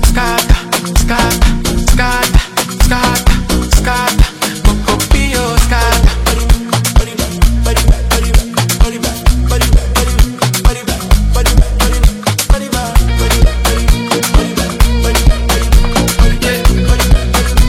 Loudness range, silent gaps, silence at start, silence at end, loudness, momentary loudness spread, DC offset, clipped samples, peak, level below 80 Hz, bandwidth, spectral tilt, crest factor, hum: 1 LU; none; 0 s; 0 s; -12 LUFS; 3 LU; 0.2%; 2%; 0 dBFS; -12 dBFS; 16.5 kHz; -4 dB/octave; 10 dB; none